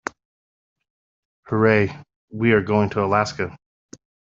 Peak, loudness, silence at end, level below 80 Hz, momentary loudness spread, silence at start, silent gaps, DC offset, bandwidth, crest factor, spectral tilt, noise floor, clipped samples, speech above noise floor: -4 dBFS; -20 LUFS; 0.8 s; -56 dBFS; 12 LU; 1.5 s; 2.16-2.28 s; under 0.1%; 7.6 kHz; 20 dB; -5.5 dB/octave; under -90 dBFS; under 0.1%; over 71 dB